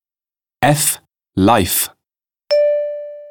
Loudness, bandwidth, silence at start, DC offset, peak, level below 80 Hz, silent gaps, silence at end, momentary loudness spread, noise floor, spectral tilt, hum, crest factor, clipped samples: -16 LUFS; 19.5 kHz; 0.6 s; under 0.1%; 0 dBFS; -48 dBFS; none; 0 s; 12 LU; under -90 dBFS; -4 dB/octave; none; 18 dB; under 0.1%